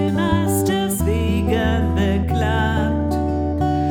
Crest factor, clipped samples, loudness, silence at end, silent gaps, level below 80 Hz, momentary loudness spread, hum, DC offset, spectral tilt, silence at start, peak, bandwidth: 12 dB; under 0.1%; -19 LUFS; 0 s; none; -32 dBFS; 2 LU; none; under 0.1%; -6 dB/octave; 0 s; -6 dBFS; 19 kHz